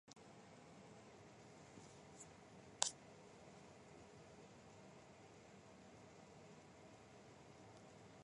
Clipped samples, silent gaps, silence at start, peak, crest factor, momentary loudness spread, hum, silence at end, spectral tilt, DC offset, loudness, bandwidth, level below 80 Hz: under 0.1%; none; 0.05 s; -16 dBFS; 42 dB; 5 LU; none; 0 s; -2 dB/octave; under 0.1%; -55 LUFS; 11 kHz; -80 dBFS